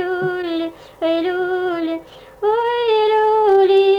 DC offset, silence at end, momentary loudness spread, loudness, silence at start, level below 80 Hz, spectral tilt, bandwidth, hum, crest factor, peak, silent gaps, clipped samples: under 0.1%; 0 s; 11 LU; -17 LUFS; 0 s; -56 dBFS; -6 dB/octave; 5.4 kHz; none; 12 dB; -6 dBFS; none; under 0.1%